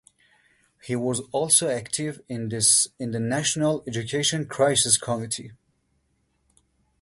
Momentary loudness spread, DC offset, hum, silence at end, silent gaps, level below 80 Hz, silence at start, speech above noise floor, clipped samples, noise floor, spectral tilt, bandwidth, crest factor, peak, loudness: 13 LU; under 0.1%; none; 1.5 s; none; -62 dBFS; 0.85 s; 46 dB; under 0.1%; -70 dBFS; -3 dB/octave; 12 kHz; 22 dB; -4 dBFS; -23 LUFS